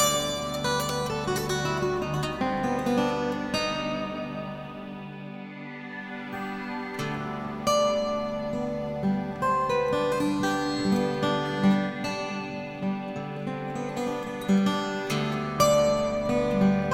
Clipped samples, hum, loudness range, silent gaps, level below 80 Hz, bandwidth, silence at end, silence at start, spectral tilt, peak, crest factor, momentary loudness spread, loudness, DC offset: under 0.1%; none; 7 LU; none; -52 dBFS; 17 kHz; 0 s; 0 s; -5 dB/octave; -8 dBFS; 18 dB; 12 LU; -27 LUFS; under 0.1%